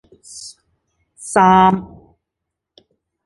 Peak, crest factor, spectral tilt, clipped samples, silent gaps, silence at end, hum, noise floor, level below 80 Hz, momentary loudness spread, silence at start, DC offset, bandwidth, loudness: -2 dBFS; 18 dB; -5.5 dB/octave; under 0.1%; none; 1.4 s; none; -80 dBFS; -50 dBFS; 25 LU; 0.35 s; under 0.1%; 11.5 kHz; -13 LUFS